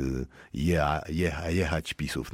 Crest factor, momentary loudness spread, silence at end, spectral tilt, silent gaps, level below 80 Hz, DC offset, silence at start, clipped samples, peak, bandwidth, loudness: 18 dB; 7 LU; 0 s; -6 dB/octave; none; -40 dBFS; under 0.1%; 0 s; under 0.1%; -10 dBFS; 16 kHz; -29 LUFS